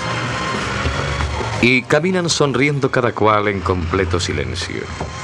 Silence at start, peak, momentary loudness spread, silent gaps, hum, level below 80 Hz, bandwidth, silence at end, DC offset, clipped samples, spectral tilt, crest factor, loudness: 0 s; 0 dBFS; 8 LU; none; none; -34 dBFS; 12 kHz; 0 s; under 0.1%; under 0.1%; -5 dB/octave; 16 dB; -18 LUFS